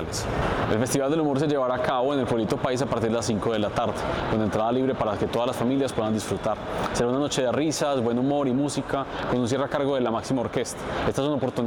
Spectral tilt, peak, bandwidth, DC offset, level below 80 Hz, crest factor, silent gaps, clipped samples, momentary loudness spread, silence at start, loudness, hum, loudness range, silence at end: -5.5 dB/octave; -14 dBFS; 19 kHz; under 0.1%; -46 dBFS; 12 dB; none; under 0.1%; 4 LU; 0 s; -25 LUFS; none; 1 LU; 0 s